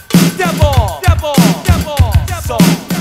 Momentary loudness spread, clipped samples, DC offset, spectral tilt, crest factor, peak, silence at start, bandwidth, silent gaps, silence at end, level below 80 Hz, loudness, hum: 3 LU; 0.2%; under 0.1%; -5.5 dB/octave; 10 dB; 0 dBFS; 0.1 s; 16.5 kHz; none; 0 s; -20 dBFS; -12 LUFS; none